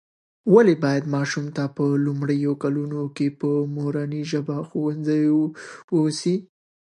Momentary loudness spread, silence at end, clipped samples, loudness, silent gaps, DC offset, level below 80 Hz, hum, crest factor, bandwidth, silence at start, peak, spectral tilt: 10 LU; 0.45 s; under 0.1%; -23 LUFS; 5.84-5.88 s; under 0.1%; -74 dBFS; none; 20 dB; 11 kHz; 0.45 s; -2 dBFS; -7 dB/octave